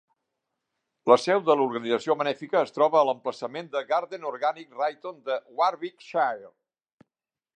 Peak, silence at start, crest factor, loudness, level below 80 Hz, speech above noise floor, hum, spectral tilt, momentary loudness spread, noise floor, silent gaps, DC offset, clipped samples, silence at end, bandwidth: -4 dBFS; 1.05 s; 22 dB; -26 LUFS; -82 dBFS; 63 dB; none; -5 dB/octave; 11 LU; -89 dBFS; none; under 0.1%; under 0.1%; 1.1 s; 9.6 kHz